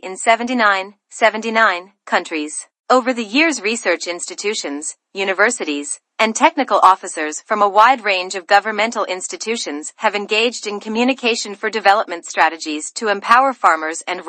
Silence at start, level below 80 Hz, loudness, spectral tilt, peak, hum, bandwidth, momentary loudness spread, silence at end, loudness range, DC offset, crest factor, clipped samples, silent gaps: 0.05 s; -68 dBFS; -17 LUFS; -1.5 dB/octave; 0 dBFS; none; 11.5 kHz; 11 LU; 0 s; 4 LU; under 0.1%; 18 dB; under 0.1%; 2.79-2.84 s